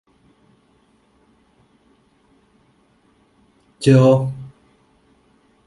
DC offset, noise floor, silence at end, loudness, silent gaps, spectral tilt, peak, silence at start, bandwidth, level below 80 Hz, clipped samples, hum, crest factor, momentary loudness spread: under 0.1%; -59 dBFS; 1.2 s; -15 LUFS; none; -8 dB/octave; -2 dBFS; 3.8 s; 11.5 kHz; -58 dBFS; under 0.1%; none; 20 dB; 24 LU